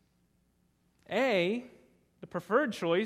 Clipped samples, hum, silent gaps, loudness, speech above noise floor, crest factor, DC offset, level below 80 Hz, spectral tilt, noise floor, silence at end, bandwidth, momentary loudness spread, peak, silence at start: under 0.1%; none; none; -31 LUFS; 42 dB; 20 dB; under 0.1%; -76 dBFS; -5.5 dB/octave; -72 dBFS; 0 s; 15 kHz; 12 LU; -14 dBFS; 1.1 s